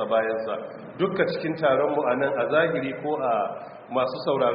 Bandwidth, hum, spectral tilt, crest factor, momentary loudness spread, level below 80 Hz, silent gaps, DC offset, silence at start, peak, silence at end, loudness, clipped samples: 5.2 kHz; none; -4 dB/octave; 18 dB; 9 LU; -66 dBFS; none; under 0.1%; 0 s; -8 dBFS; 0 s; -25 LUFS; under 0.1%